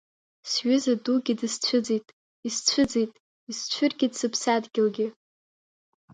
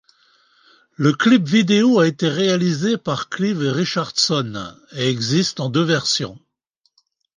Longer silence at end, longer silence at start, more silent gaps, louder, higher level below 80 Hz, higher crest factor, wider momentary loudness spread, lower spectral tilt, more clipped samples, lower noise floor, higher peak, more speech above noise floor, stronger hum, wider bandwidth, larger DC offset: about the same, 1.05 s vs 1 s; second, 0.45 s vs 1 s; first, 2.13-2.43 s, 3.20-3.47 s vs none; second, -26 LUFS vs -18 LUFS; about the same, -64 dBFS vs -60 dBFS; about the same, 20 dB vs 18 dB; about the same, 9 LU vs 8 LU; second, -3 dB/octave vs -5 dB/octave; neither; first, under -90 dBFS vs -68 dBFS; second, -6 dBFS vs -2 dBFS; first, over 65 dB vs 50 dB; neither; about the same, 9.6 kHz vs 10 kHz; neither